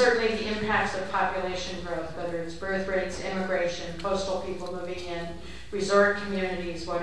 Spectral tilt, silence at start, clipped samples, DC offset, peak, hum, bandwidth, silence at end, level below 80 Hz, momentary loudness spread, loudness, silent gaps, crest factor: -4.5 dB/octave; 0 s; under 0.1%; 0.9%; -8 dBFS; none; 11 kHz; 0 s; -48 dBFS; 11 LU; -29 LUFS; none; 20 dB